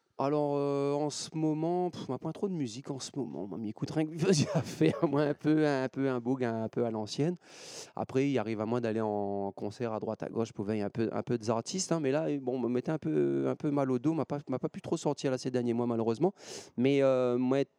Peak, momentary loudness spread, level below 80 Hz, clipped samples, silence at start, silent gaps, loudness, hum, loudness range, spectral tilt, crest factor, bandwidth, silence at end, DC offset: -14 dBFS; 10 LU; -76 dBFS; under 0.1%; 0.2 s; none; -32 LUFS; none; 4 LU; -6 dB/octave; 18 dB; 12 kHz; 0.15 s; under 0.1%